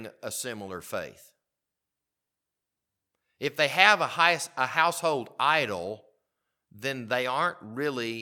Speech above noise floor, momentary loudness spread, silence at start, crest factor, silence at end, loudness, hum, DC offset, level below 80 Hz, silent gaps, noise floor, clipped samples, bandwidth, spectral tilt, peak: 59 dB; 16 LU; 0 s; 28 dB; 0 s; -26 LUFS; none; under 0.1%; -76 dBFS; none; -87 dBFS; under 0.1%; 18.5 kHz; -2.5 dB/octave; -2 dBFS